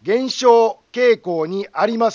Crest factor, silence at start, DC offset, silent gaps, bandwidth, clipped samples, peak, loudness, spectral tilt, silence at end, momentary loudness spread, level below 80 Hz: 16 dB; 0.05 s; under 0.1%; none; 7.4 kHz; under 0.1%; -2 dBFS; -17 LUFS; -4.5 dB/octave; 0 s; 9 LU; -70 dBFS